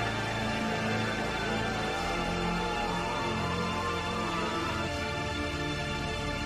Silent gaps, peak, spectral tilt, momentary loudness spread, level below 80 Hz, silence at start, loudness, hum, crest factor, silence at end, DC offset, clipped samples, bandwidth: none; -18 dBFS; -4.5 dB/octave; 2 LU; -46 dBFS; 0 s; -31 LUFS; none; 14 dB; 0 s; under 0.1%; under 0.1%; 15 kHz